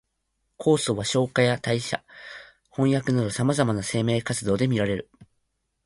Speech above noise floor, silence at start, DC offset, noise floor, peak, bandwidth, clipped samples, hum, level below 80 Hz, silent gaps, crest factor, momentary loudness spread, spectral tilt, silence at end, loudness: 52 dB; 0.6 s; under 0.1%; -76 dBFS; -6 dBFS; 11.5 kHz; under 0.1%; none; -54 dBFS; none; 20 dB; 13 LU; -5.5 dB/octave; 0.6 s; -24 LUFS